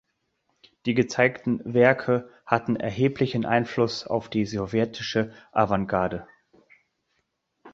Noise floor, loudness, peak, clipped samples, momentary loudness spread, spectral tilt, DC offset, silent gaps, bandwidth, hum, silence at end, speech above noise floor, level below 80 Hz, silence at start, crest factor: -75 dBFS; -25 LUFS; -2 dBFS; under 0.1%; 8 LU; -6.5 dB/octave; under 0.1%; none; 7.8 kHz; none; 0.05 s; 51 dB; -56 dBFS; 0.85 s; 24 dB